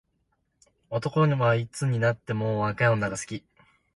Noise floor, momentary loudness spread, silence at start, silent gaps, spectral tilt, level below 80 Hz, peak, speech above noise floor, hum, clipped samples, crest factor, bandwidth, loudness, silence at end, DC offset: -73 dBFS; 11 LU; 0.9 s; none; -6.5 dB/octave; -60 dBFS; -10 dBFS; 48 dB; none; under 0.1%; 18 dB; 11.5 kHz; -26 LUFS; 0.55 s; under 0.1%